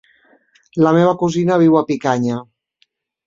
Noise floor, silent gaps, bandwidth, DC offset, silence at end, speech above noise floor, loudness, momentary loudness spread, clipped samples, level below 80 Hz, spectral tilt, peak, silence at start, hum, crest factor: -63 dBFS; none; 7.6 kHz; under 0.1%; 0.85 s; 49 dB; -15 LUFS; 10 LU; under 0.1%; -58 dBFS; -7.5 dB/octave; -2 dBFS; 0.75 s; none; 16 dB